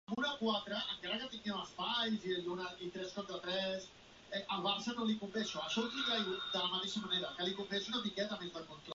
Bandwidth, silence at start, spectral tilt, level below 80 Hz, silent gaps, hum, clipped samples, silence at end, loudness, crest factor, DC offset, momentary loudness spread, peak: 7.6 kHz; 0.1 s; -1.5 dB/octave; -74 dBFS; none; none; under 0.1%; 0 s; -38 LUFS; 18 dB; under 0.1%; 9 LU; -22 dBFS